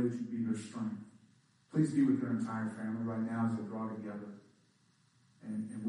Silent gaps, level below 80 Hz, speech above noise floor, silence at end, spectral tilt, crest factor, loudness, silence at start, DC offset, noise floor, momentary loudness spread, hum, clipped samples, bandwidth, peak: none; -80 dBFS; 35 dB; 0 s; -8 dB/octave; 18 dB; -36 LUFS; 0 s; under 0.1%; -70 dBFS; 17 LU; none; under 0.1%; 10.5 kHz; -18 dBFS